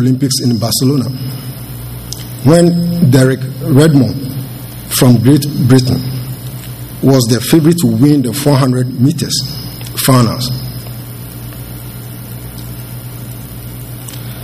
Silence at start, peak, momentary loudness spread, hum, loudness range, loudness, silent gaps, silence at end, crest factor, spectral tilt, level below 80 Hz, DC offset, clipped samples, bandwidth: 0 s; 0 dBFS; 17 LU; none; 12 LU; -11 LUFS; none; 0 s; 12 dB; -6 dB/octave; -38 dBFS; under 0.1%; 0.5%; 16 kHz